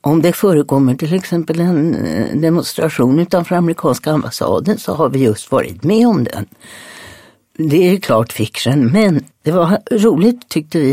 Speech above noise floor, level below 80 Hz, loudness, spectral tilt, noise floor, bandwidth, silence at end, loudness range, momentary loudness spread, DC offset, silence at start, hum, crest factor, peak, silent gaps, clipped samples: 28 dB; -50 dBFS; -14 LUFS; -6.5 dB/octave; -42 dBFS; 16.5 kHz; 0 s; 2 LU; 6 LU; under 0.1%; 0.05 s; none; 14 dB; 0 dBFS; none; under 0.1%